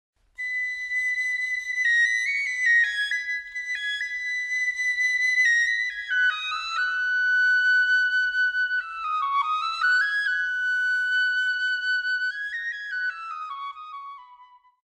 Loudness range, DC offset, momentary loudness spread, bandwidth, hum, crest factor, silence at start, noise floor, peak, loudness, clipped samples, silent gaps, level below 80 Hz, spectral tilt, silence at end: 4 LU; under 0.1%; 10 LU; 12 kHz; none; 14 dB; 0.4 s; -53 dBFS; -12 dBFS; -23 LUFS; under 0.1%; none; -66 dBFS; 5 dB/octave; 0.45 s